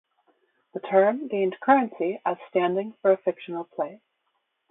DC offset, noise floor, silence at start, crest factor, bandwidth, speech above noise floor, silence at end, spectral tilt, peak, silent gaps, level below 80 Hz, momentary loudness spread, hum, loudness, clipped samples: under 0.1%; -75 dBFS; 0.75 s; 18 dB; 4 kHz; 51 dB; 0.75 s; -10.5 dB/octave; -8 dBFS; none; -80 dBFS; 13 LU; none; -25 LUFS; under 0.1%